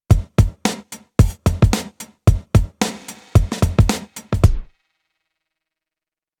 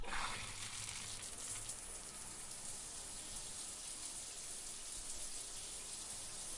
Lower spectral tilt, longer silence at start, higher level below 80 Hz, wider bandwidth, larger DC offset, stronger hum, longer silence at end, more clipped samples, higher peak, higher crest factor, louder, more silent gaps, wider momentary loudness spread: first, -6 dB/octave vs -0.5 dB/octave; about the same, 0.1 s vs 0 s; first, -24 dBFS vs -60 dBFS; first, 17 kHz vs 11.5 kHz; neither; neither; first, 1.75 s vs 0 s; neither; first, 0 dBFS vs -28 dBFS; about the same, 18 dB vs 20 dB; first, -19 LUFS vs -45 LUFS; neither; first, 10 LU vs 3 LU